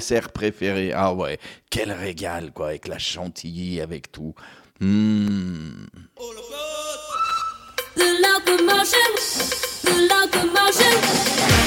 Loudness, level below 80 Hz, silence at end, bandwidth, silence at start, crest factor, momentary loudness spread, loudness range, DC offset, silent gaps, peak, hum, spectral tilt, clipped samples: -20 LUFS; -42 dBFS; 0 s; 17 kHz; 0 s; 18 dB; 18 LU; 11 LU; under 0.1%; none; -2 dBFS; none; -3 dB/octave; under 0.1%